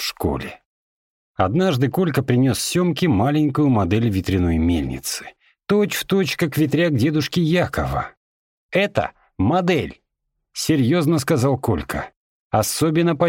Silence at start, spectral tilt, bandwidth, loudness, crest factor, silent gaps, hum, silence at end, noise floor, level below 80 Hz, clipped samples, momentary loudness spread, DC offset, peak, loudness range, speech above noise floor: 0 s; -5.5 dB/octave; 17 kHz; -20 LUFS; 16 dB; 0.66-1.35 s, 8.17-8.69 s, 12.16-12.50 s; none; 0 s; -76 dBFS; -40 dBFS; under 0.1%; 10 LU; under 0.1%; -4 dBFS; 3 LU; 57 dB